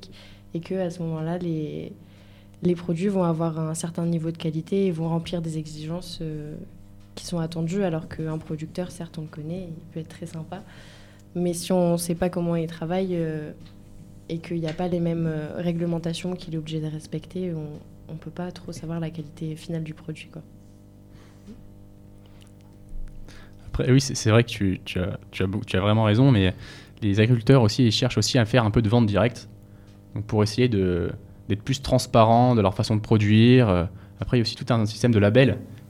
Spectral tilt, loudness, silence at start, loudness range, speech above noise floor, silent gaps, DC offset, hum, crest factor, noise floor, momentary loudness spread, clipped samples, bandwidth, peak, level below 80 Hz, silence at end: -6.5 dB/octave; -24 LUFS; 0 s; 14 LU; 25 dB; none; under 0.1%; none; 20 dB; -48 dBFS; 18 LU; under 0.1%; 14 kHz; -4 dBFS; -46 dBFS; 0.1 s